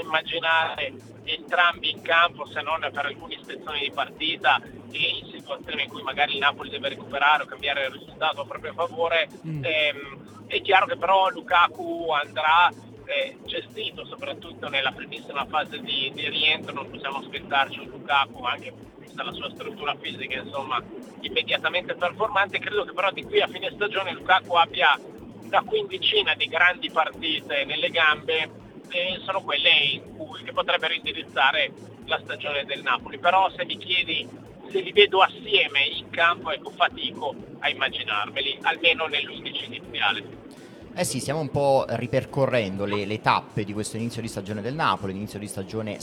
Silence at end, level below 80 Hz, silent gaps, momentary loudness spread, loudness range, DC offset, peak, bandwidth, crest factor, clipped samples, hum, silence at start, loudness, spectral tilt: 0 s; -60 dBFS; none; 13 LU; 5 LU; under 0.1%; -2 dBFS; 19 kHz; 24 dB; under 0.1%; none; 0 s; -24 LUFS; -3.5 dB/octave